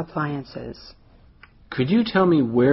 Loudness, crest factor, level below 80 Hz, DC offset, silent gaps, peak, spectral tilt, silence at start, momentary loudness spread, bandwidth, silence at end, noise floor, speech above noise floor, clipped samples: -21 LUFS; 16 dB; -52 dBFS; under 0.1%; none; -6 dBFS; -6 dB/octave; 0 s; 18 LU; 6 kHz; 0 s; -50 dBFS; 30 dB; under 0.1%